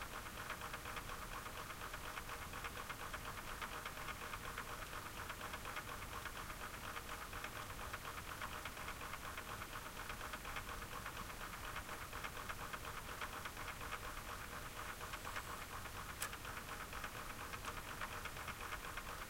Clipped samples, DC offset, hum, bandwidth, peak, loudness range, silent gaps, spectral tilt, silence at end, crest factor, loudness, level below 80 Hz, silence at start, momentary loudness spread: under 0.1%; under 0.1%; none; 16.5 kHz; -24 dBFS; 0 LU; none; -2.5 dB/octave; 0 s; 24 dB; -48 LUFS; -56 dBFS; 0 s; 2 LU